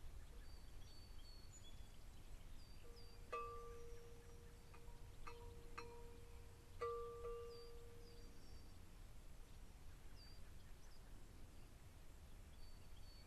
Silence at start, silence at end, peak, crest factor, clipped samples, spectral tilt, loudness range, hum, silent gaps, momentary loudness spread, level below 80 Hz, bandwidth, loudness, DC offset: 0 s; 0 s; -36 dBFS; 18 dB; under 0.1%; -4.5 dB/octave; 9 LU; none; none; 13 LU; -60 dBFS; 13 kHz; -59 LUFS; under 0.1%